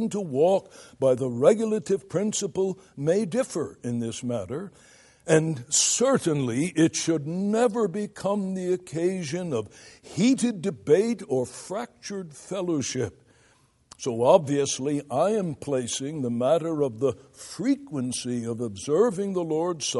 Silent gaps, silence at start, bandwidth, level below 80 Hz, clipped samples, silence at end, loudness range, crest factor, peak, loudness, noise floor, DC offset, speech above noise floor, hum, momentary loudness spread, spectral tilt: none; 0 s; 11.5 kHz; -66 dBFS; under 0.1%; 0 s; 4 LU; 20 dB; -4 dBFS; -26 LUFS; -62 dBFS; under 0.1%; 36 dB; none; 11 LU; -4.5 dB/octave